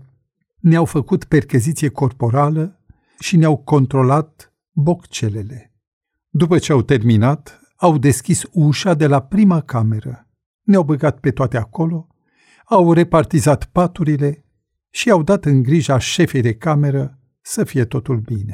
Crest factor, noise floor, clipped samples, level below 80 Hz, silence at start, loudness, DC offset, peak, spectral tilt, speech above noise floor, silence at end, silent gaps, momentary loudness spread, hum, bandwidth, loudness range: 14 dB; -66 dBFS; under 0.1%; -44 dBFS; 0.65 s; -16 LUFS; under 0.1%; -2 dBFS; -6.5 dB/octave; 51 dB; 0 s; 5.87-6.01 s, 10.46-10.59 s; 9 LU; none; 15 kHz; 3 LU